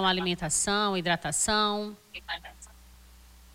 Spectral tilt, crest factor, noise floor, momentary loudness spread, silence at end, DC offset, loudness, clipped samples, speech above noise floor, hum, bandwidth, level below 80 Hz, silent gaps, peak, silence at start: -2.5 dB/octave; 18 dB; -53 dBFS; 14 LU; 0.85 s; under 0.1%; -27 LUFS; under 0.1%; 24 dB; none; 16.5 kHz; -52 dBFS; none; -12 dBFS; 0 s